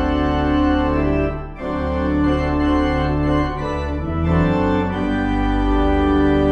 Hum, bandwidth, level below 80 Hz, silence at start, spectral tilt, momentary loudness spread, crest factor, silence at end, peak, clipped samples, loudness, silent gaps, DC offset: none; 7.4 kHz; -24 dBFS; 0 s; -8.5 dB/octave; 7 LU; 12 dB; 0 s; -6 dBFS; under 0.1%; -19 LUFS; none; under 0.1%